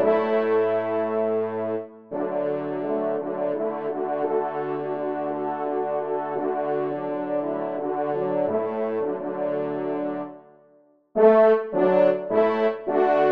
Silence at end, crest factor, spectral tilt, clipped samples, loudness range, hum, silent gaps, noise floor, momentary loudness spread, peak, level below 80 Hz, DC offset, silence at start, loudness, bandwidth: 0 s; 18 dB; -9 dB/octave; under 0.1%; 5 LU; none; none; -58 dBFS; 9 LU; -6 dBFS; -74 dBFS; 0.1%; 0 s; -24 LUFS; 5.2 kHz